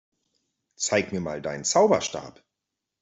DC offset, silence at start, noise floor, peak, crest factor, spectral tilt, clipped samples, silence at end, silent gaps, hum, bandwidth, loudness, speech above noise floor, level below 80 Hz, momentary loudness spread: under 0.1%; 0.8 s; -85 dBFS; -8 dBFS; 20 dB; -3.5 dB/octave; under 0.1%; 0.7 s; none; none; 8.2 kHz; -24 LUFS; 60 dB; -64 dBFS; 12 LU